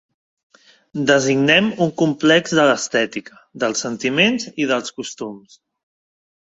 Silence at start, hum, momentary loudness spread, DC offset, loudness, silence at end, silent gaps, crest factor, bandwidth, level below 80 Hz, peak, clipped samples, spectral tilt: 0.95 s; none; 15 LU; under 0.1%; -17 LUFS; 1.2 s; none; 18 dB; 8 kHz; -62 dBFS; 0 dBFS; under 0.1%; -4 dB/octave